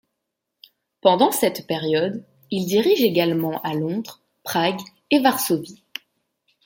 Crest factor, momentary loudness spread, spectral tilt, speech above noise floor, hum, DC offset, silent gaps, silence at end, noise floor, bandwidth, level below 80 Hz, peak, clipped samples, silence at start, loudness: 20 dB; 18 LU; -4.5 dB/octave; 60 dB; none; under 0.1%; none; 0.9 s; -80 dBFS; 17 kHz; -68 dBFS; -2 dBFS; under 0.1%; 1.05 s; -21 LUFS